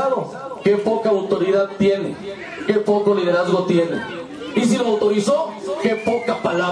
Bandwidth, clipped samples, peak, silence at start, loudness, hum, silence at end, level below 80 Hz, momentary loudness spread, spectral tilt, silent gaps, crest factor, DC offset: 10.5 kHz; under 0.1%; -4 dBFS; 0 s; -19 LUFS; none; 0 s; -60 dBFS; 9 LU; -6 dB/octave; none; 14 dB; under 0.1%